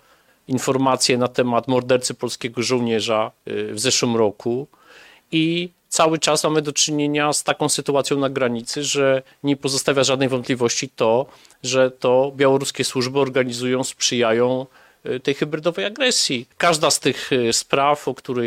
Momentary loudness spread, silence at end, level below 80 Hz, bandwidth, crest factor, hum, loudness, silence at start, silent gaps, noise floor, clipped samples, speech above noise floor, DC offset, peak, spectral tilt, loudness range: 8 LU; 0 s; -62 dBFS; 16 kHz; 20 dB; none; -20 LUFS; 0.5 s; none; -48 dBFS; under 0.1%; 28 dB; under 0.1%; 0 dBFS; -3.5 dB/octave; 2 LU